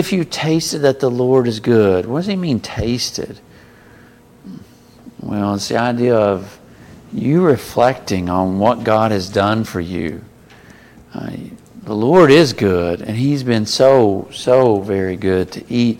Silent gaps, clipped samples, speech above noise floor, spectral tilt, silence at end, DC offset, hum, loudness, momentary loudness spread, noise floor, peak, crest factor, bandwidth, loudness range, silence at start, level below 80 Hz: none; under 0.1%; 30 dB; -6 dB/octave; 0.05 s; under 0.1%; none; -16 LUFS; 17 LU; -45 dBFS; 0 dBFS; 16 dB; 17 kHz; 8 LU; 0 s; -46 dBFS